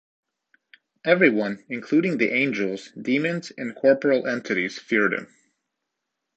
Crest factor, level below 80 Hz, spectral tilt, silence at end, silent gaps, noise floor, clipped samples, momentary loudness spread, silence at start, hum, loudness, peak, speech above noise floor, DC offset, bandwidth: 22 dB; -72 dBFS; -6 dB/octave; 1.1 s; none; -81 dBFS; under 0.1%; 12 LU; 1.05 s; none; -23 LUFS; -2 dBFS; 59 dB; under 0.1%; 8.2 kHz